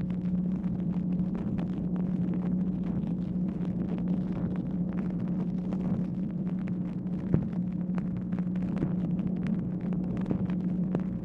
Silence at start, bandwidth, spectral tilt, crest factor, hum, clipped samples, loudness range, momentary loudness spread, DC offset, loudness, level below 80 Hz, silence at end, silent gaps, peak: 0 s; 4 kHz; -11 dB/octave; 22 dB; none; under 0.1%; 1 LU; 2 LU; under 0.1%; -31 LUFS; -48 dBFS; 0 s; none; -8 dBFS